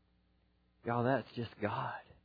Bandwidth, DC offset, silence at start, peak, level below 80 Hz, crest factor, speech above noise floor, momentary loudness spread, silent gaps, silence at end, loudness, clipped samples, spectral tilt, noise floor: 5 kHz; under 0.1%; 0.85 s; -18 dBFS; -72 dBFS; 20 dB; 36 dB; 11 LU; none; 0.25 s; -37 LUFS; under 0.1%; -5.5 dB/octave; -73 dBFS